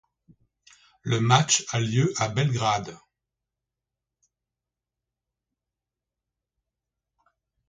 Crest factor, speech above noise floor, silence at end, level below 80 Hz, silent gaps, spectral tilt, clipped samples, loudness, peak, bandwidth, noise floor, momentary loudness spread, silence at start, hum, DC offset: 26 dB; 64 dB; 4.75 s; -62 dBFS; none; -4 dB/octave; under 0.1%; -23 LUFS; -4 dBFS; 9.6 kHz; -88 dBFS; 10 LU; 1.05 s; 60 Hz at -50 dBFS; under 0.1%